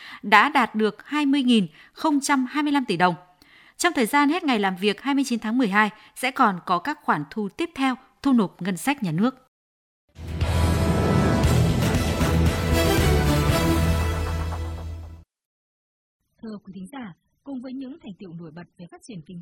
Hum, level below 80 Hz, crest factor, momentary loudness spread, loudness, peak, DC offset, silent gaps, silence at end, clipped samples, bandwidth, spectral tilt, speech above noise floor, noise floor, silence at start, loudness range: none; -36 dBFS; 24 dB; 19 LU; -22 LUFS; 0 dBFS; under 0.1%; 9.48-10.08 s, 15.45-16.20 s; 0 s; under 0.1%; 16.5 kHz; -5.5 dB/octave; 30 dB; -54 dBFS; 0 s; 17 LU